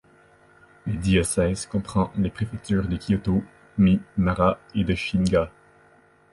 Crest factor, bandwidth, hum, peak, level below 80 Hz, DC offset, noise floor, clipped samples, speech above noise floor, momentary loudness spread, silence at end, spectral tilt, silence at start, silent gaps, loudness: 18 dB; 11.5 kHz; none; -6 dBFS; -40 dBFS; under 0.1%; -57 dBFS; under 0.1%; 34 dB; 8 LU; 0.85 s; -6 dB/octave; 0.85 s; none; -24 LUFS